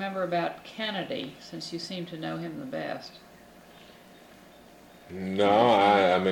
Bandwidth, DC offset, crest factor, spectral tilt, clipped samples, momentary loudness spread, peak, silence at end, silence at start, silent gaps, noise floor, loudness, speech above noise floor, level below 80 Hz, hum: 18.5 kHz; under 0.1%; 20 dB; -5.5 dB/octave; under 0.1%; 18 LU; -10 dBFS; 0 s; 0 s; none; -52 dBFS; -27 LUFS; 25 dB; -68 dBFS; none